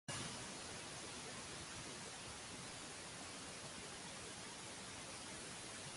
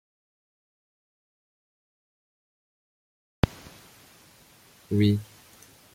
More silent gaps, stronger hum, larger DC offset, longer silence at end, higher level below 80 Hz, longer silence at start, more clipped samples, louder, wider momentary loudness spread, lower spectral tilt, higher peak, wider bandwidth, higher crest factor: neither; neither; neither; second, 0 s vs 0.7 s; second, -70 dBFS vs -50 dBFS; second, 0.1 s vs 3.45 s; neither; second, -49 LUFS vs -27 LUFS; second, 2 LU vs 25 LU; second, -2 dB/octave vs -7 dB/octave; second, -34 dBFS vs -2 dBFS; second, 11.5 kHz vs 16 kHz; second, 18 dB vs 30 dB